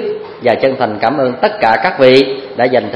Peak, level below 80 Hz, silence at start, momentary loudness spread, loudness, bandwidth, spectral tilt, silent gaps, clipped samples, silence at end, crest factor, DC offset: 0 dBFS; -52 dBFS; 0 s; 8 LU; -12 LUFS; 9.6 kHz; -6.5 dB/octave; none; 0.3%; 0 s; 12 dB; under 0.1%